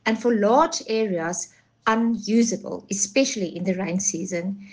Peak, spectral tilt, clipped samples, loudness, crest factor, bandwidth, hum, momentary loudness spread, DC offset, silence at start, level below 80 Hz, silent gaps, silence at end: -6 dBFS; -4 dB/octave; under 0.1%; -23 LUFS; 18 dB; 10.5 kHz; none; 10 LU; under 0.1%; 0.05 s; -62 dBFS; none; 0 s